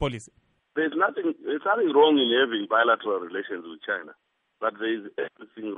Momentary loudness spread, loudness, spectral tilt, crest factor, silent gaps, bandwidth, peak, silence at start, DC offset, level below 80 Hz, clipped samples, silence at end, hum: 16 LU; -25 LUFS; -5.5 dB/octave; 18 dB; none; 9 kHz; -8 dBFS; 0 s; under 0.1%; -56 dBFS; under 0.1%; 0 s; none